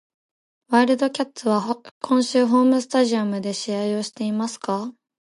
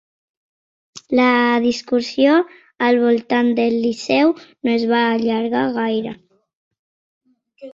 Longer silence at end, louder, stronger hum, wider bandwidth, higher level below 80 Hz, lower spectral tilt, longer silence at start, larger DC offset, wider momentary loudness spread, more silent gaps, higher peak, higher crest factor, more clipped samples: first, 0.3 s vs 0 s; second, -22 LUFS vs -17 LUFS; neither; first, 11.5 kHz vs 7.6 kHz; second, -74 dBFS vs -62 dBFS; about the same, -5 dB/octave vs -5 dB/octave; second, 0.7 s vs 0.95 s; neither; first, 9 LU vs 6 LU; second, 1.91-2.01 s vs 6.55-6.71 s, 6.79-7.21 s; second, -6 dBFS vs -2 dBFS; about the same, 16 dB vs 16 dB; neither